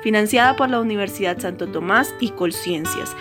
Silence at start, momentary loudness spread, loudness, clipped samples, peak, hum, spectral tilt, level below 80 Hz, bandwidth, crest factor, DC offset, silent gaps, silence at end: 0 s; 10 LU; -20 LUFS; under 0.1%; -2 dBFS; none; -4 dB/octave; -56 dBFS; 17 kHz; 18 dB; under 0.1%; none; 0 s